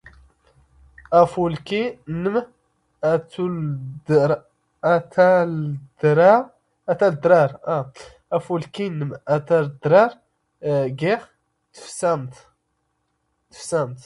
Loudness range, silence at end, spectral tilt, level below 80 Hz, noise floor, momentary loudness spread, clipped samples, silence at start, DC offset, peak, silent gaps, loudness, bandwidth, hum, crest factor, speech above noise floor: 5 LU; 0.05 s; -7 dB/octave; -58 dBFS; -72 dBFS; 12 LU; under 0.1%; 1.1 s; under 0.1%; -2 dBFS; none; -20 LUFS; 11.5 kHz; none; 20 dB; 52 dB